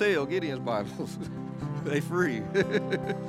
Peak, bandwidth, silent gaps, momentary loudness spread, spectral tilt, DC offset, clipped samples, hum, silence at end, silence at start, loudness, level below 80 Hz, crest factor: -12 dBFS; 14.5 kHz; none; 9 LU; -6.5 dB/octave; under 0.1%; under 0.1%; none; 0 s; 0 s; -30 LUFS; -58 dBFS; 18 dB